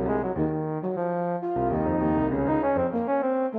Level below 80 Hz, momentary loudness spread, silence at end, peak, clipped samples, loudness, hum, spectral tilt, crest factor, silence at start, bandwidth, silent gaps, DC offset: -46 dBFS; 4 LU; 0 s; -12 dBFS; under 0.1%; -26 LUFS; none; -11.5 dB/octave; 14 dB; 0 s; 4.3 kHz; none; under 0.1%